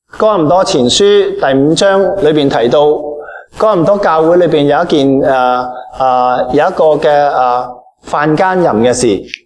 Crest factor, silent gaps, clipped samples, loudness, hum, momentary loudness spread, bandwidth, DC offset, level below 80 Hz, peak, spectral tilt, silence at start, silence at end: 10 dB; none; under 0.1%; -10 LUFS; none; 7 LU; 11 kHz; under 0.1%; -42 dBFS; 0 dBFS; -5 dB/octave; 0.15 s; 0.15 s